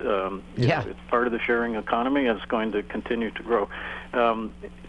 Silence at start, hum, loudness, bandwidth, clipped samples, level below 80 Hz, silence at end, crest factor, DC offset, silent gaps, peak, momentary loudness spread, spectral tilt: 0 s; none; -26 LUFS; 10.5 kHz; under 0.1%; -48 dBFS; 0 s; 18 dB; under 0.1%; none; -8 dBFS; 7 LU; -7.5 dB/octave